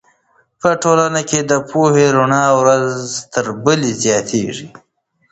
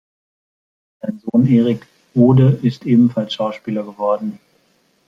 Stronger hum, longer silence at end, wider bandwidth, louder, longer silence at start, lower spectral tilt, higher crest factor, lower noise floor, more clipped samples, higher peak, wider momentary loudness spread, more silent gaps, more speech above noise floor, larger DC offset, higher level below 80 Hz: neither; about the same, 0.65 s vs 0.75 s; first, 8.8 kHz vs 6.6 kHz; about the same, -14 LUFS vs -16 LUFS; second, 0.65 s vs 1.05 s; second, -4.5 dB/octave vs -9.5 dB/octave; about the same, 16 dB vs 16 dB; about the same, -57 dBFS vs -60 dBFS; neither; about the same, 0 dBFS vs -2 dBFS; second, 9 LU vs 14 LU; neither; about the same, 43 dB vs 45 dB; neither; about the same, -54 dBFS vs -56 dBFS